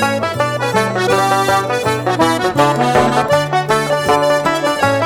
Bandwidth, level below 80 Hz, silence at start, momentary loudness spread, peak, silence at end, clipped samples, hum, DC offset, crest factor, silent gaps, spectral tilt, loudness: 18 kHz; -44 dBFS; 0 s; 4 LU; 0 dBFS; 0 s; under 0.1%; none; under 0.1%; 14 dB; none; -4.5 dB/octave; -14 LUFS